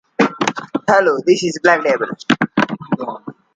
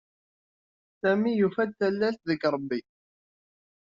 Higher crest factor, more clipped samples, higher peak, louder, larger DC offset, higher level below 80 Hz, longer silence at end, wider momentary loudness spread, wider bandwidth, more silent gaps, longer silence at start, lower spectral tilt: about the same, 16 dB vs 18 dB; neither; first, 0 dBFS vs -12 dBFS; first, -16 LUFS vs -27 LUFS; neither; first, -62 dBFS vs -72 dBFS; second, 0.25 s vs 1.15 s; about the same, 9 LU vs 7 LU; first, 9.2 kHz vs 7.2 kHz; neither; second, 0.2 s vs 1.05 s; about the same, -5 dB/octave vs -5 dB/octave